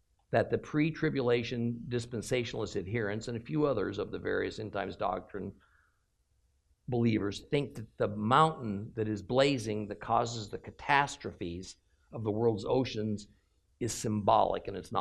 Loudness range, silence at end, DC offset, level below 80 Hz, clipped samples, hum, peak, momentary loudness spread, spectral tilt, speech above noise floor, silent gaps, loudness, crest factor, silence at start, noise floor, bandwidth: 5 LU; 0 s; under 0.1%; -60 dBFS; under 0.1%; none; -10 dBFS; 13 LU; -5.5 dB/octave; 42 dB; none; -32 LUFS; 22 dB; 0.3 s; -74 dBFS; 13 kHz